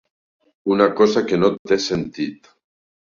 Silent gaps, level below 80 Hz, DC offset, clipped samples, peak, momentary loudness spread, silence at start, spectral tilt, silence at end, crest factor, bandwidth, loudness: 1.59-1.65 s; -54 dBFS; under 0.1%; under 0.1%; -2 dBFS; 13 LU; 0.65 s; -5.5 dB/octave; 0.7 s; 18 dB; 7.4 kHz; -19 LUFS